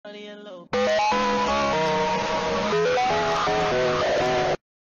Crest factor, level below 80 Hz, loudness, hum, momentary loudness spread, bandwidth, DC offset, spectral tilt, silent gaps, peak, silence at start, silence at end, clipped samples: 8 dB; -48 dBFS; -23 LUFS; none; 7 LU; 7.6 kHz; under 0.1%; -4 dB/octave; none; -14 dBFS; 0.05 s; 0.25 s; under 0.1%